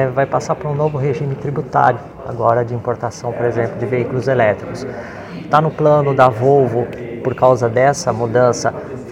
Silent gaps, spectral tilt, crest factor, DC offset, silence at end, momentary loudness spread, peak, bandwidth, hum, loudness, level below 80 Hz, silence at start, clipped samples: none; -6.5 dB/octave; 16 dB; under 0.1%; 0 s; 12 LU; 0 dBFS; 12 kHz; none; -16 LUFS; -48 dBFS; 0 s; under 0.1%